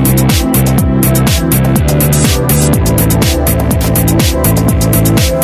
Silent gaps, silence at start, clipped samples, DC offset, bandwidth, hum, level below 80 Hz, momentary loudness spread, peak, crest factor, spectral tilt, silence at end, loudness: none; 0 s; under 0.1%; under 0.1%; 16 kHz; none; -18 dBFS; 1 LU; 0 dBFS; 10 dB; -5 dB/octave; 0 s; -10 LUFS